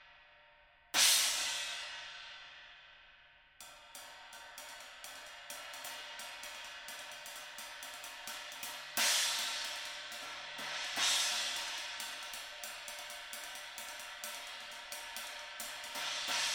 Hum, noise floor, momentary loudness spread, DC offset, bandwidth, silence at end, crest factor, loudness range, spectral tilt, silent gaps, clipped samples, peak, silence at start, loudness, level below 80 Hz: none; -64 dBFS; 20 LU; under 0.1%; over 20 kHz; 0 s; 26 dB; 14 LU; 2.5 dB/octave; none; under 0.1%; -14 dBFS; 0 s; -37 LUFS; -74 dBFS